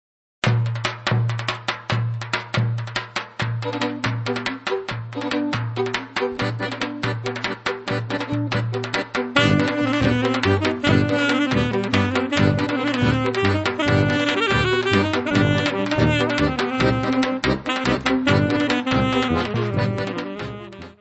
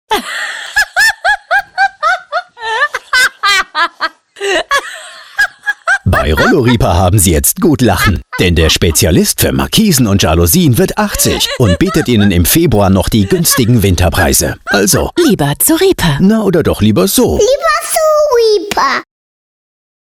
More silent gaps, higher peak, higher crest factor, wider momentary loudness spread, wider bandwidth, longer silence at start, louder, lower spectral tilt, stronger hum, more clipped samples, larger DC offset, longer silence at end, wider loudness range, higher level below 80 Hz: neither; about the same, 0 dBFS vs 0 dBFS; first, 20 dB vs 10 dB; about the same, 8 LU vs 6 LU; second, 8.4 kHz vs 19.5 kHz; first, 0.45 s vs 0.1 s; second, -21 LUFS vs -10 LUFS; first, -6 dB/octave vs -4 dB/octave; neither; neither; neither; second, 0.1 s vs 1 s; first, 6 LU vs 3 LU; second, -42 dBFS vs -26 dBFS